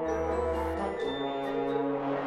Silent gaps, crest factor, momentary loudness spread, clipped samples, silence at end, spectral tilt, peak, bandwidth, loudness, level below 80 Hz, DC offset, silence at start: none; 12 dB; 2 LU; under 0.1%; 0 s; -6.5 dB/octave; -18 dBFS; 13 kHz; -31 LUFS; -46 dBFS; under 0.1%; 0 s